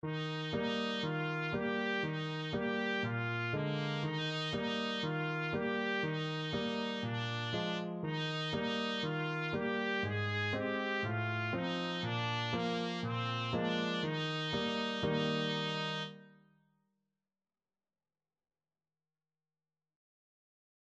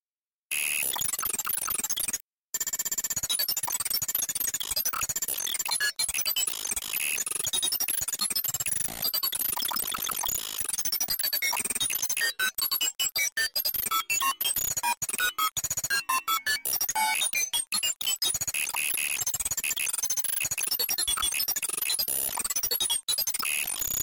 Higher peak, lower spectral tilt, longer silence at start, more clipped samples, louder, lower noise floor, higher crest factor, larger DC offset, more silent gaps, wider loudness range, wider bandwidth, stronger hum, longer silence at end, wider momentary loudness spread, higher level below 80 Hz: second, -22 dBFS vs -14 dBFS; first, -6 dB/octave vs 1.5 dB/octave; second, 0.05 s vs 0.5 s; neither; second, -36 LUFS vs -26 LUFS; about the same, under -90 dBFS vs under -90 dBFS; about the same, 16 dB vs 16 dB; neither; second, none vs 2.22-2.53 s, 13.32-13.36 s, 14.97-15.01 s, 15.52-15.56 s, 17.96-18.00 s, 23.03-23.07 s; about the same, 2 LU vs 2 LU; second, 8.4 kHz vs 17 kHz; neither; first, 4.6 s vs 0 s; about the same, 3 LU vs 3 LU; second, -68 dBFS vs -58 dBFS